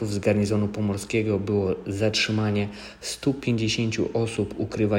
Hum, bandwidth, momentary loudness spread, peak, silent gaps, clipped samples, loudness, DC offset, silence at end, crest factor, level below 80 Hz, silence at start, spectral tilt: none; 16 kHz; 6 LU; -8 dBFS; none; under 0.1%; -25 LUFS; under 0.1%; 0 s; 16 dB; -52 dBFS; 0 s; -5.5 dB/octave